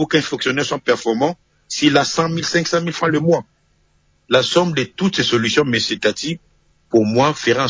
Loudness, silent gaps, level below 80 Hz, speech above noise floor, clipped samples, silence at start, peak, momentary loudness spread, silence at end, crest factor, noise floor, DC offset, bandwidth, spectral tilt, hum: -17 LUFS; none; -54 dBFS; 42 dB; under 0.1%; 0 s; -2 dBFS; 6 LU; 0 s; 16 dB; -60 dBFS; under 0.1%; 7.8 kHz; -4.5 dB/octave; none